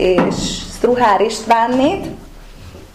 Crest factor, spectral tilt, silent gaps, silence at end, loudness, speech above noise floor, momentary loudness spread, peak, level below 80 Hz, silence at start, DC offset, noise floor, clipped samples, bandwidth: 14 dB; -4.5 dB/octave; none; 0.1 s; -15 LUFS; 22 dB; 11 LU; -2 dBFS; -36 dBFS; 0 s; 0.2%; -36 dBFS; under 0.1%; 15.5 kHz